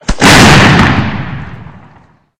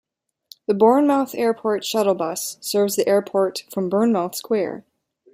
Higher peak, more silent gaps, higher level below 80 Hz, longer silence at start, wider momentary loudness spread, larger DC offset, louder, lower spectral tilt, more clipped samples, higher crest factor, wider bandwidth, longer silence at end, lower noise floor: first, 0 dBFS vs -4 dBFS; neither; first, -24 dBFS vs -70 dBFS; second, 0.1 s vs 0.7 s; first, 19 LU vs 10 LU; neither; first, -5 LUFS vs -20 LUFS; about the same, -4.5 dB/octave vs -4.5 dB/octave; first, 4% vs under 0.1%; second, 8 dB vs 18 dB; first, over 20 kHz vs 16 kHz; first, 0.7 s vs 0.55 s; second, -44 dBFS vs -50 dBFS